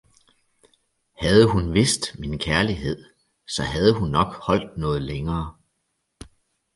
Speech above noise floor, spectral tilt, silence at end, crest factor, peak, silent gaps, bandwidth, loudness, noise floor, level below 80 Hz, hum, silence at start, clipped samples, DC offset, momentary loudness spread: 53 dB; -5 dB/octave; 1.25 s; 22 dB; -2 dBFS; none; 11.5 kHz; -22 LUFS; -75 dBFS; -40 dBFS; none; 1.2 s; under 0.1%; under 0.1%; 12 LU